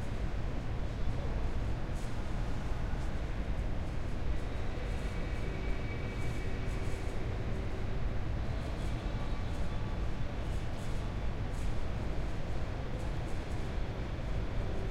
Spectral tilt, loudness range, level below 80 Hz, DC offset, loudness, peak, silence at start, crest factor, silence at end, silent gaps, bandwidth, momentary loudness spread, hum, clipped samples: -6.5 dB/octave; 1 LU; -36 dBFS; under 0.1%; -39 LUFS; -20 dBFS; 0 s; 12 dB; 0 s; none; 11 kHz; 2 LU; none; under 0.1%